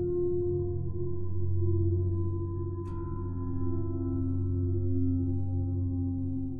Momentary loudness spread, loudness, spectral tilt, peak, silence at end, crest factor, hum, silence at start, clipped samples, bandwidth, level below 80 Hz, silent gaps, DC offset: 6 LU; -32 LUFS; -14 dB/octave; -18 dBFS; 0 s; 12 dB; none; 0 s; under 0.1%; 1.5 kHz; -44 dBFS; none; under 0.1%